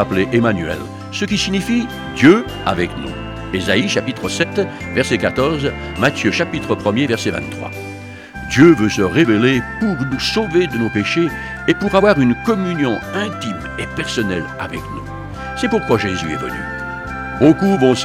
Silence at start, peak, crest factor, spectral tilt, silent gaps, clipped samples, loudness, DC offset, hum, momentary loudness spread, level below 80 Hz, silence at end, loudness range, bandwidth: 0 s; 0 dBFS; 16 dB; -5.5 dB/octave; none; under 0.1%; -17 LUFS; under 0.1%; none; 14 LU; -38 dBFS; 0 s; 6 LU; 15.5 kHz